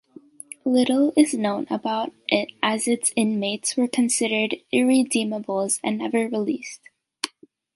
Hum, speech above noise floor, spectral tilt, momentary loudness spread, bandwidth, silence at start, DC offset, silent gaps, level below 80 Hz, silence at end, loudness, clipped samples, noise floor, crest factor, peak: none; 28 dB; -3 dB/octave; 12 LU; 11.5 kHz; 0.65 s; under 0.1%; none; -72 dBFS; 0.5 s; -23 LUFS; under 0.1%; -50 dBFS; 20 dB; -2 dBFS